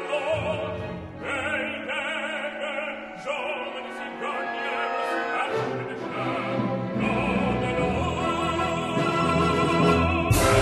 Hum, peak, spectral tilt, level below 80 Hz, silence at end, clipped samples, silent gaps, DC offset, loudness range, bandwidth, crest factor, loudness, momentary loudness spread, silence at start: none; -8 dBFS; -5.5 dB/octave; -42 dBFS; 0 s; under 0.1%; none; under 0.1%; 6 LU; 13 kHz; 18 dB; -26 LUFS; 10 LU; 0 s